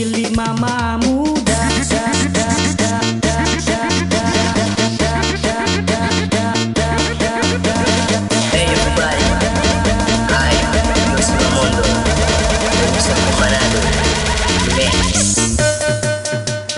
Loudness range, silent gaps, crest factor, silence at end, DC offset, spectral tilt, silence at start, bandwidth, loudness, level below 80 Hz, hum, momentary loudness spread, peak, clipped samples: 2 LU; none; 14 dB; 0 s; under 0.1%; -4 dB/octave; 0 s; 11.5 kHz; -15 LUFS; -24 dBFS; none; 3 LU; -2 dBFS; under 0.1%